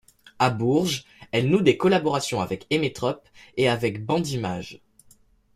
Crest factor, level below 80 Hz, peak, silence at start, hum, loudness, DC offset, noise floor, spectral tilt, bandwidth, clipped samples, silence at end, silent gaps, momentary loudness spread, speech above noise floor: 20 dB; -58 dBFS; -6 dBFS; 0.4 s; none; -24 LUFS; under 0.1%; -57 dBFS; -5.5 dB/octave; 15 kHz; under 0.1%; 0.8 s; none; 11 LU; 34 dB